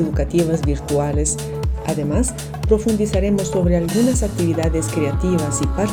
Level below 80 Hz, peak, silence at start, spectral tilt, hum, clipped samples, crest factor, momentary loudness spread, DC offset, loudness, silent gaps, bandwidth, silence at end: -26 dBFS; -4 dBFS; 0 s; -6 dB/octave; none; under 0.1%; 16 dB; 5 LU; under 0.1%; -19 LUFS; none; 19 kHz; 0 s